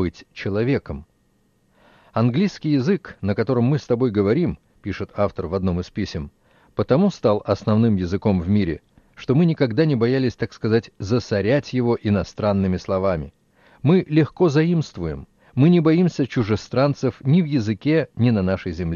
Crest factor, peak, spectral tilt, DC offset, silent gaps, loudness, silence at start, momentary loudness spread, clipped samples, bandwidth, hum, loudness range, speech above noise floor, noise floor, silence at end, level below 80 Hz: 16 dB; -4 dBFS; -8 dB/octave; under 0.1%; none; -21 LUFS; 0 s; 11 LU; under 0.1%; 7.2 kHz; none; 4 LU; 43 dB; -62 dBFS; 0 s; -46 dBFS